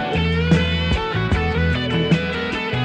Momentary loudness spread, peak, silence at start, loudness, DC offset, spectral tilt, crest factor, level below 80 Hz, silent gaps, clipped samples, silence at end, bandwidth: 4 LU; -4 dBFS; 0 s; -19 LUFS; under 0.1%; -6.5 dB/octave; 16 dB; -28 dBFS; none; under 0.1%; 0 s; 9 kHz